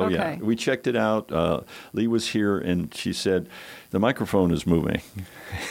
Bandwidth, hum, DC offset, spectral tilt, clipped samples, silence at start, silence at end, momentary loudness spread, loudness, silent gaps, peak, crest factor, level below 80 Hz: 17 kHz; none; under 0.1%; -6 dB/octave; under 0.1%; 0 s; 0 s; 11 LU; -25 LUFS; none; -6 dBFS; 18 dB; -48 dBFS